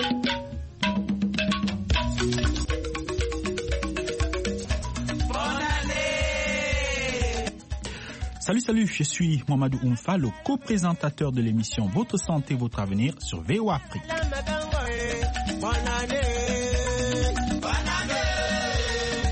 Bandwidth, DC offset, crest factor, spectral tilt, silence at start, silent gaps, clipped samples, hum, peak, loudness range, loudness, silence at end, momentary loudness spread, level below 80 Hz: 8.8 kHz; under 0.1%; 18 dB; -5 dB/octave; 0 s; none; under 0.1%; none; -8 dBFS; 2 LU; -27 LUFS; 0 s; 5 LU; -34 dBFS